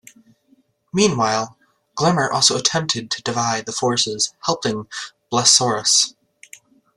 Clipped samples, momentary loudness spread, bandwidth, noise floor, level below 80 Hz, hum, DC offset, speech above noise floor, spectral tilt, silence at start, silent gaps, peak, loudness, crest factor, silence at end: under 0.1%; 12 LU; 13.5 kHz; -60 dBFS; -58 dBFS; none; under 0.1%; 40 dB; -2.5 dB/octave; 0.95 s; none; 0 dBFS; -18 LUFS; 20 dB; 0.85 s